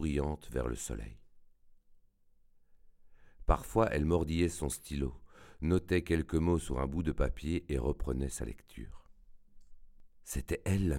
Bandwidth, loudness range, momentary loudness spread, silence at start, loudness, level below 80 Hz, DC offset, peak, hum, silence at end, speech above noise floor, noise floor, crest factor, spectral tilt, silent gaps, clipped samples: 16.5 kHz; 7 LU; 13 LU; 0 s; -34 LUFS; -42 dBFS; under 0.1%; -12 dBFS; none; 0 s; 32 dB; -65 dBFS; 22 dB; -6.5 dB/octave; none; under 0.1%